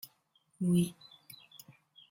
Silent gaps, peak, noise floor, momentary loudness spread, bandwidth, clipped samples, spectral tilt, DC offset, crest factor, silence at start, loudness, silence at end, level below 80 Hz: none; -20 dBFS; -73 dBFS; 24 LU; 16.5 kHz; under 0.1%; -7 dB/octave; under 0.1%; 18 dB; 0.6 s; -32 LUFS; 1.2 s; -70 dBFS